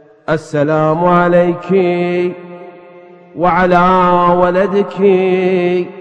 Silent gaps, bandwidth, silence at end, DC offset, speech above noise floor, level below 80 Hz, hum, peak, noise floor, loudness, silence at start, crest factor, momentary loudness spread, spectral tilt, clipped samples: none; 8.4 kHz; 0 s; under 0.1%; 27 dB; -42 dBFS; none; 0 dBFS; -38 dBFS; -12 LUFS; 0.3 s; 12 dB; 9 LU; -8 dB/octave; under 0.1%